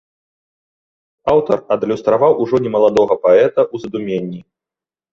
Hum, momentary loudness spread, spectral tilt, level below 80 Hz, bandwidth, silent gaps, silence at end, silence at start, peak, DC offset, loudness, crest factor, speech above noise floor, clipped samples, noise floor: none; 12 LU; -7.5 dB/octave; -54 dBFS; 7.4 kHz; none; 0.7 s; 1.25 s; -2 dBFS; under 0.1%; -15 LUFS; 14 dB; 75 dB; under 0.1%; -89 dBFS